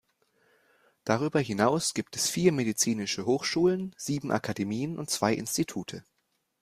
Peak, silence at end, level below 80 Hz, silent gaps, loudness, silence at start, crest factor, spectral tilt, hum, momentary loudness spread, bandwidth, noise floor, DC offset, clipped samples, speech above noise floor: -10 dBFS; 0.6 s; -64 dBFS; none; -28 LUFS; 1.05 s; 20 dB; -4 dB/octave; none; 8 LU; 15.5 kHz; -69 dBFS; under 0.1%; under 0.1%; 41 dB